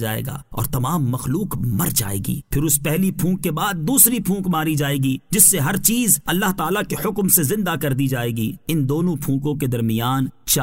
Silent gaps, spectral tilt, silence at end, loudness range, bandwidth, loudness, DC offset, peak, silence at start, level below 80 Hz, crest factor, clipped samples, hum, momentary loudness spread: none; -4 dB/octave; 0 s; 5 LU; 16.5 kHz; -19 LUFS; 0.4%; 0 dBFS; 0 s; -42 dBFS; 20 dB; under 0.1%; none; 11 LU